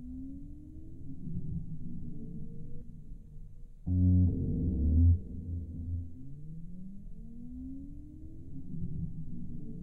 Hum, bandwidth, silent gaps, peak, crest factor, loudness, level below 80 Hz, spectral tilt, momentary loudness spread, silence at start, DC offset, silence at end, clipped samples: none; 0.8 kHz; none; -16 dBFS; 16 dB; -34 LUFS; -40 dBFS; -13.5 dB/octave; 23 LU; 0 s; under 0.1%; 0 s; under 0.1%